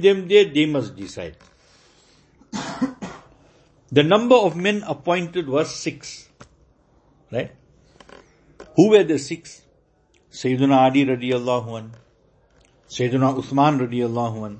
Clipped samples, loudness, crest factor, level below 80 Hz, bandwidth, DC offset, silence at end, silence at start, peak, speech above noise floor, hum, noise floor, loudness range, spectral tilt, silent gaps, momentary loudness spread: under 0.1%; -20 LUFS; 20 dB; -58 dBFS; 8.6 kHz; under 0.1%; 0 s; 0 s; 0 dBFS; 41 dB; none; -60 dBFS; 8 LU; -6 dB/octave; none; 20 LU